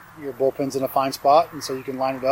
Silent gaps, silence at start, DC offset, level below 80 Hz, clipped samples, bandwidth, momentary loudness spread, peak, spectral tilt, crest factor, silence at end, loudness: none; 0 s; under 0.1%; -62 dBFS; under 0.1%; 16.5 kHz; 11 LU; -6 dBFS; -4.5 dB/octave; 16 dB; 0 s; -22 LUFS